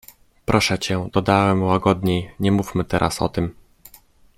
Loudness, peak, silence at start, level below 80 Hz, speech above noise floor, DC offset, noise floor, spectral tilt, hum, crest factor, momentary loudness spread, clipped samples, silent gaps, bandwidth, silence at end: -20 LUFS; -2 dBFS; 0.5 s; -44 dBFS; 31 dB; under 0.1%; -51 dBFS; -5.5 dB/octave; none; 20 dB; 6 LU; under 0.1%; none; 16 kHz; 0.85 s